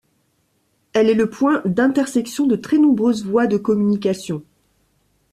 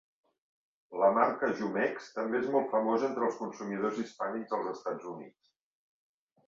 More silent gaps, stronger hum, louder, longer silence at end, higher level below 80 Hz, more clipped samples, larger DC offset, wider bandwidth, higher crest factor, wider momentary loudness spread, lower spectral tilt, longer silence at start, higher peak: neither; neither; first, -18 LUFS vs -32 LUFS; second, 0.9 s vs 1.2 s; first, -60 dBFS vs -78 dBFS; neither; neither; first, 14 kHz vs 7.6 kHz; second, 14 dB vs 22 dB; second, 7 LU vs 11 LU; about the same, -6.5 dB/octave vs -6 dB/octave; about the same, 0.95 s vs 0.9 s; first, -4 dBFS vs -12 dBFS